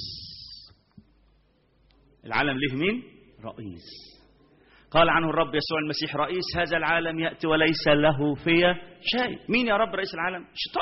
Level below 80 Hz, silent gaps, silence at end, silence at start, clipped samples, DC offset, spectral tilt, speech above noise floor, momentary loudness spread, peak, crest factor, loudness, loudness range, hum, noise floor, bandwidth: -52 dBFS; none; 0 s; 0 s; under 0.1%; under 0.1%; -3 dB/octave; 39 dB; 20 LU; -4 dBFS; 22 dB; -25 LUFS; 8 LU; none; -64 dBFS; 6 kHz